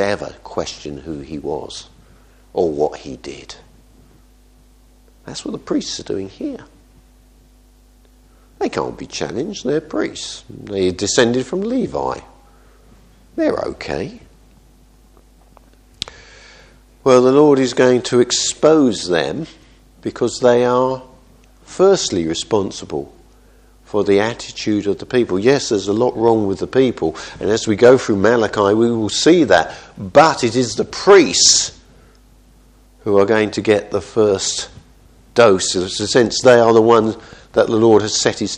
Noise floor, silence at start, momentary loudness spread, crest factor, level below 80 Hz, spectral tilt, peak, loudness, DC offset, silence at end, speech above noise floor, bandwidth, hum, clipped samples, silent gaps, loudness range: -49 dBFS; 0 s; 18 LU; 18 dB; -48 dBFS; -4 dB/octave; 0 dBFS; -16 LUFS; under 0.1%; 0 s; 33 dB; 10 kHz; none; under 0.1%; none; 14 LU